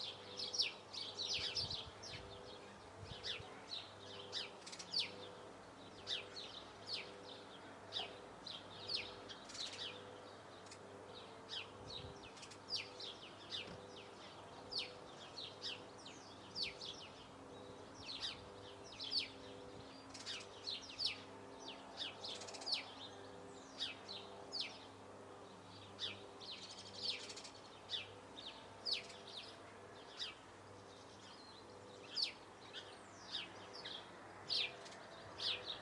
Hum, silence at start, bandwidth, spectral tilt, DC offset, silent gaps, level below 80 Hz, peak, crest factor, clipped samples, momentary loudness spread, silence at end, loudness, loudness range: none; 0 s; 12 kHz; -2 dB/octave; under 0.1%; none; -76 dBFS; -22 dBFS; 26 dB; under 0.1%; 15 LU; 0 s; -47 LUFS; 4 LU